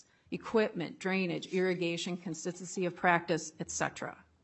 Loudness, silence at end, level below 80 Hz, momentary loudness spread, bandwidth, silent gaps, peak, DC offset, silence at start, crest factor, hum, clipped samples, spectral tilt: -34 LUFS; 0.25 s; -74 dBFS; 10 LU; 8.4 kHz; none; -12 dBFS; under 0.1%; 0.3 s; 22 dB; none; under 0.1%; -4.5 dB/octave